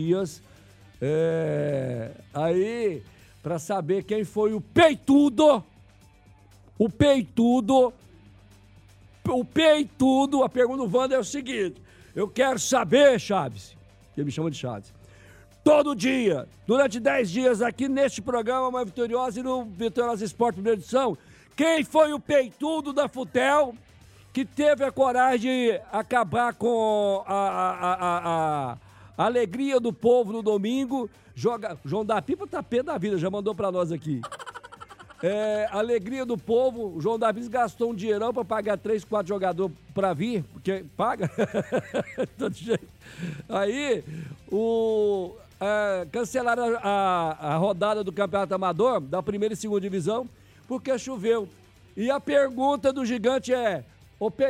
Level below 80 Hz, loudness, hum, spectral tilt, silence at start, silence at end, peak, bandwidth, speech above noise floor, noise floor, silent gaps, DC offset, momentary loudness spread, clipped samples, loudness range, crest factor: -58 dBFS; -25 LUFS; none; -5.5 dB/octave; 0 s; 0 s; -8 dBFS; 15 kHz; 30 dB; -54 dBFS; none; under 0.1%; 11 LU; under 0.1%; 5 LU; 18 dB